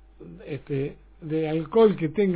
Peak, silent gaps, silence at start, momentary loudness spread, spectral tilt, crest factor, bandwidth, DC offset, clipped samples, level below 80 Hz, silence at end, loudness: -8 dBFS; none; 0.2 s; 18 LU; -11.5 dB/octave; 16 dB; 4 kHz; under 0.1%; under 0.1%; -54 dBFS; 0 s; -24 LUFS